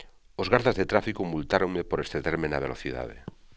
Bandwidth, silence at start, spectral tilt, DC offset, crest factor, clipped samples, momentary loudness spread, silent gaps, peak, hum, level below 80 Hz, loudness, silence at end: 8 kHz; 0 s; -6.5 dB/octave; 0.1%; 26 dB; under 0.1%; 13 LU; none; -4 dBFS; none; -46 dBFS; -28 LUFS; 0 s